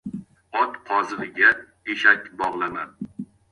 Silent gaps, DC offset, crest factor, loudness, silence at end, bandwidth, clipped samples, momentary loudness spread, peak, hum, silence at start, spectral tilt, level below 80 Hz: none; under 0.1%; 22 dB; -21 LUFS; 0.25 s; 11 kHz; under 0.1%; 19 LU; -2 dBFS; none; 0.05 s; -4.5 dB/octave; -62 dBFS